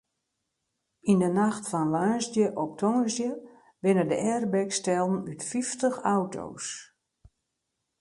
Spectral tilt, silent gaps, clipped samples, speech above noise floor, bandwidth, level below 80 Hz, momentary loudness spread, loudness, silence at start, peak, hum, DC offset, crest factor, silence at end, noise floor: -5.5 dB/octave; none; under 0.1%; 55 dB; 11.5 kHz; -68 dBFS; 10 LU; -27 LUFS; 1.05 s; -10 dBFS; none; under 0.1%; 18 dB; 1.15 s; -82 dBFS